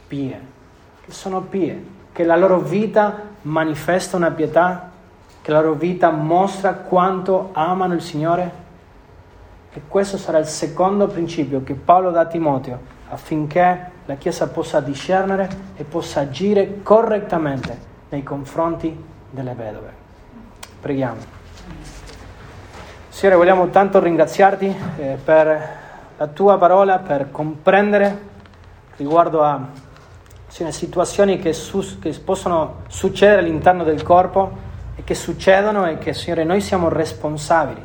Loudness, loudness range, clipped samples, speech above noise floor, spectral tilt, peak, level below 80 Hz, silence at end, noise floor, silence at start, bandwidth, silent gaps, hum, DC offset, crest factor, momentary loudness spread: -18 LUFS; 7 LU; under 0.1%; 28 dB; -6 dB/octave; 0 dBFS; -46 dBFS; 0 s; -45 dBFS; 0.1 s; 19 kHz; none; none; under 0.1%; 18 dB; 19 LU